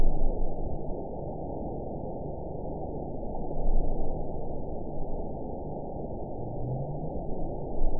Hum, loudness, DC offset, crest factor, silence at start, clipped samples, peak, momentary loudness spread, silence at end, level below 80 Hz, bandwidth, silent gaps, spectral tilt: none; -36 LUFS; 1%; 16 dB; 0 s; under 0.1%; -10 dBFS; 4 LU; 0 s; -30 dBFS; 1 kHz; none; -16 dB/octave